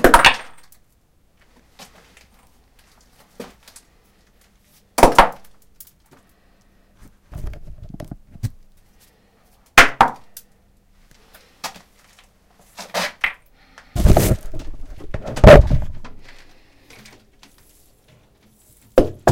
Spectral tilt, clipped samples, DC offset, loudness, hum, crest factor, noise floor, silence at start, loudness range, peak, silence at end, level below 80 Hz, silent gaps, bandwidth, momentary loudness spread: -5 dB/octave; 0.2%; under 0.1%; -15 LUFS; none; 20 dB; -58 dBFS; 0 s; 20 LU; 0 dBFS; 0 s; -26 dBFS; none; 17 kHz; 29 LU